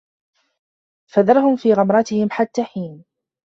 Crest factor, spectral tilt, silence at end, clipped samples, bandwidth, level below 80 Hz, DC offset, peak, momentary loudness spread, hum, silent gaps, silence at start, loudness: 16 dB; -7 dB/octave; 0.5 s; under 0.1%; 7.6 kHz; -64 dBFS; under 0.1%; -2 dBFS; 13 LU; none; none; 1.15 s; -17 LUFS